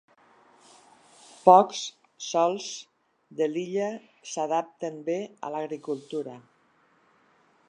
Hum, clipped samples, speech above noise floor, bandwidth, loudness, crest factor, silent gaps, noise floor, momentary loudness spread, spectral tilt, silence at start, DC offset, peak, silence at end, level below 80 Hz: none; under 0.1%; 39 dB; 10.5 kHz; -26 LUFS; 26 dB; none; -65 dBFS; 20 LU; -4.5 dB/octave; 1.45 s; under 0.1%; -2 dBFS; 1.3 s; -86 dBFS